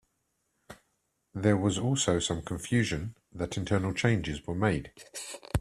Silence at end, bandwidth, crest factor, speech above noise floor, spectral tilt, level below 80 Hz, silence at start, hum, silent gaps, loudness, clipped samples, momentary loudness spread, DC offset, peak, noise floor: 0 s; 14 kHz; 22 dB; 48 dB; -5 dB/octave; -50 dBFS; 0.7 s; none; none; -30 LUFS; under 0.1%; 13 LU; under 0.1%; -10 dBFS; -77 dBFS